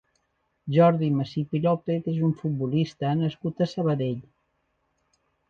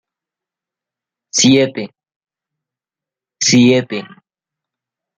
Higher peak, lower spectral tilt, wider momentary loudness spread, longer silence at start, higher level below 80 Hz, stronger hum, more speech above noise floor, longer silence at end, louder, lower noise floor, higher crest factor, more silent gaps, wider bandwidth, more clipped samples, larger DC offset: second, -8 dBFS vs 0 dBFS; first, -9 dB/octave vs -3.5 dB/octave; second, 8 LU vs 16 LU; second, 0.65 s vs 1.35 s; about the same, -62 dBFS vs -58 dBFS; neither; second, 49 dB vs 76 dB; first, 1.3 s vs 1.15 s; second, -25 LUFS vs -12 LUFS; second, -74 dBFS vs -88 dBFS; about the same, 18 dB vs 18 dB; second, none vs 2.16-2.20 s; second, 7 kHz vs 9.4 kHz; neither; neither